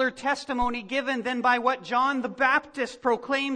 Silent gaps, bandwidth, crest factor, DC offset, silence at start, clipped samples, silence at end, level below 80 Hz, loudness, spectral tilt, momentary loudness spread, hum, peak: none; 10 kHz; 18 dB; under 0.1%; 0 s; under 0.1%; 0 s; -52 dBFS; -26 LUFS; -3.5 dB/octave; 6 LU; none; -8 dBFS